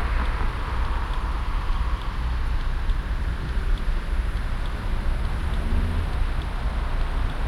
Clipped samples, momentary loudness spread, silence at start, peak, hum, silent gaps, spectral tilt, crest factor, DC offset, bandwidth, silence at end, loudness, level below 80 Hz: under 0.1%; 3 LU; 0 s; -12 dBFS; none; none; -6.5 dB/octave; 12 dB; under 0.1%; 11.5 kHz; 0 s; -29 LUFS; -24 dBFS